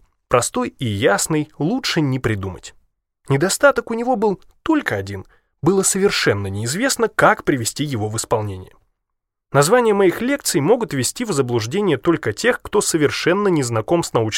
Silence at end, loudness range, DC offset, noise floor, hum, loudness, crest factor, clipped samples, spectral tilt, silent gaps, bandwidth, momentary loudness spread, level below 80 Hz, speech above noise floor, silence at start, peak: 0 s; 2 LU; under 0.1%; -77 dBFS; none; -18 LUFS; 18 dB; under 0.1%; -4.5 dB/octave; none; 16.5 kHz; 8 LU; -50 dBFS; 59 dB; 0.3 s; 0 dBFS